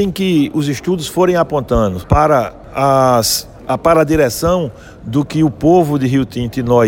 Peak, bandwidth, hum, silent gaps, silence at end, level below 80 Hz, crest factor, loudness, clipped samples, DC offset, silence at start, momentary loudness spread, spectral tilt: 0 dBFS; 17 kHz; none; none; 0 s; -32 dBFS; 14 dB; -14 LUFS; under 0.1%; under 0.1%; 0 s; 8 LU; -5.5 dB/octave